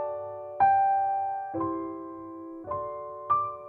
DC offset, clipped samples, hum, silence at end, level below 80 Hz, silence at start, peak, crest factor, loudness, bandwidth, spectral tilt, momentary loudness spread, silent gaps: under 0.1%; under 0.1%; none; 0 s; -64 dBFS; 0 s; -14 dBFS; 16 dB; -28 LUFS; 3.4 kHz; -10 dB/octave; 17 LU; none